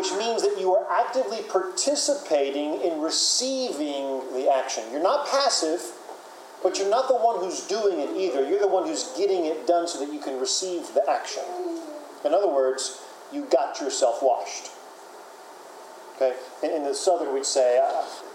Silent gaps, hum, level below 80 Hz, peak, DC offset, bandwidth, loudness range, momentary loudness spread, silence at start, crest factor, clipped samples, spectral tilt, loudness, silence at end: none; none; under -90 dBFS; -8 dBFS; under 0.1%; 16 kHz; 4 LU; 18 LU; 0 s; 18 dB; under 0.1%; -1 dB/octave; -25 LUFS; 0 s